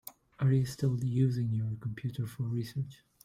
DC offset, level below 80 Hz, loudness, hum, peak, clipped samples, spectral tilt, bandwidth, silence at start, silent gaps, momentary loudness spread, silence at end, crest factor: under 0.1%; -62 dBFS; -33 LUFS; none; -18 dBFS; under 0.1%; -8 dB/octave; 16 kHz; 0.05 s; none; 9 LU; 0.3 s; 14 dB